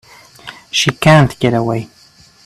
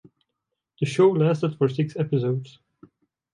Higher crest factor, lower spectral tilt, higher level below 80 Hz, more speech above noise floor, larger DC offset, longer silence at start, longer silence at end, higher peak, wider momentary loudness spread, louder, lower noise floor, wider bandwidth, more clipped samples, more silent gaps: about the same, 16 dB vs 18 dB; second, -5 dB/octave vs -8 dB/octave; first, -46 dBFS vs -68 dBFS; second, 24 dB vs 60 dB; neither; second, 0.45 s vs 0.8 s; second, 0.6 s vs 0.85 s; first, 0 dBFS vs -8 dBFS; first, 24 LU vs 9 LU; first, -13 LUFS vs -23 LUFS; second, -36 dBFS vs -82 dBFS; first, 13.5 kHz vs 10.5 kHz; neither; neither